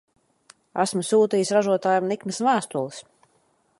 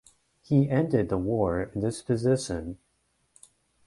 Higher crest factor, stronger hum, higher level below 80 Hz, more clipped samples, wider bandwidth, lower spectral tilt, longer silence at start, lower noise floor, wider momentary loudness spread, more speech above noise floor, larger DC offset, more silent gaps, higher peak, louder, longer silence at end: about the same, 18 dB vs 18 dB; neither; second, -72 dBFS vs -50 dBFS; neither; about the same, 11.5 kHz vs 11.5 kHz; second, -4.5 dB/octave vs -7 dB/octave; first, 0.75 s vs 0.5 s; second, -65 dBFS vs -72 dBFS; about the same, 12 LU vs 11 LU; about the same, 43 dB vs 46 dB; neither; neither; first, -6 dBFS vs -10 dBFS; first, -23 LUFS vs -27 LUFS; second, 0.8 s vs 1.1 s